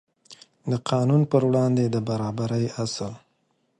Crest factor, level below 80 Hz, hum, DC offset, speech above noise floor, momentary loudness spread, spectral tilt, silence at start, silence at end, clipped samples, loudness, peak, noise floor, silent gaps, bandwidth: 18 dB; -60 dBFS; none; under 0.1%; 47 dB; 10 LU; -7 dB/octave; 0.3 s; 0.6 s; under 0.1%; -24 LUFS; -6 dBFS; -70 dBFS; none; 10.5 kHz